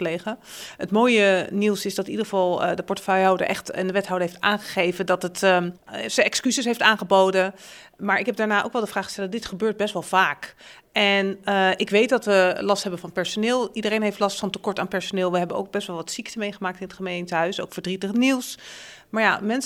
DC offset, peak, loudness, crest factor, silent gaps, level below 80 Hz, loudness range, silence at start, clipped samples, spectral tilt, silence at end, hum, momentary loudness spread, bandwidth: under 0.1%; 0 dBFS; -23 LUFS; 22 dB; none; -64 dBFS; 5 LU; 0 s; under 0.1%; -4 dB/octave; 0 s; none; 12 LU; 17.5 kHz